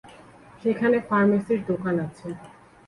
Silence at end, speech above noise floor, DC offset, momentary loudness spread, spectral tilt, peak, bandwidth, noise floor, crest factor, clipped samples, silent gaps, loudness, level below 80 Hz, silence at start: 0.35 s; 25 dB; under 0.1%; 17 LU; -8.5 dB/octave; -10 dBFS; 11 kHz; -49 dBFS; 14 dB; under 0.1%; none; -24 LUFS; -60 dBFS; 0.05 s